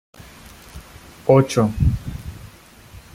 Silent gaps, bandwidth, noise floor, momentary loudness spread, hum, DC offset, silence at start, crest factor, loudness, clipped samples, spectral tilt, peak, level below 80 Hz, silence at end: none; 16 kHz; -44 dBFS; 26 LU; none; under 0.1%; 0.75 s; 20 dB; -19 LUFS; under 0.1%; -7 dB/octave; -2 dBFS; -34 dBFS; 0.15 s